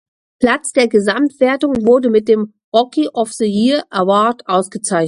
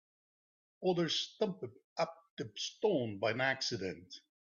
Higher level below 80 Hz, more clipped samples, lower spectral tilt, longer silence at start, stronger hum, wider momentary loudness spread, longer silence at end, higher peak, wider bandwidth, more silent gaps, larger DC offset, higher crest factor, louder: first, -54 dBFS vs -80 dBFS; neither; about the same, -4.5 dB/octave vs -4 dB/octave; second, 0.4 s vs 0.8 s; neither; second, 5 LU vs 13 LU; second, 0 s vs 0.25 s; first, 0 dBFS vs -20 dBFS; first, 11.5 kHz vs 7.4 kHz; second, 2.64-2.72 s vs 1.84-1.96 s, 2.30-2.37 s; neither; about the same, 14 dB vs 18 dB; first, -15 LUFS vs -36 LUFS